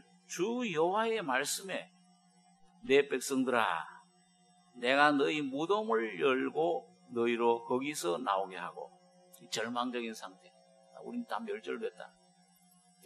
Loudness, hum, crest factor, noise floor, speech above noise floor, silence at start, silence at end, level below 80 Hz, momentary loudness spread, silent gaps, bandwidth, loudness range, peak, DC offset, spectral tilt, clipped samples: -33 LUFS; none; 24 dB; -67 dBFS; 34 dB; 0.3 s; 1 s; -84 dBFS; 15 LU; none; 13 kHz; 9 LU; -10 dBFS; under 0.1%; -3.5 dB/octave; under 0.1%